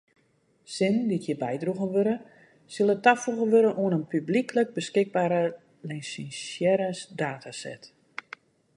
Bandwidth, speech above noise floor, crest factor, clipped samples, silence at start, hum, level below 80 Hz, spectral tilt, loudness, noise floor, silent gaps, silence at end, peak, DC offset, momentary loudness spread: 11.5 kHz; 41 dB; 22 dB; under 0.1%; 0.7 s; none; -74 dBFS; -5.5 dB/octave; -26 LUFS; -67 dBFS; none; 0.9 s; -4 dBFS; under 0.1%; 19 LU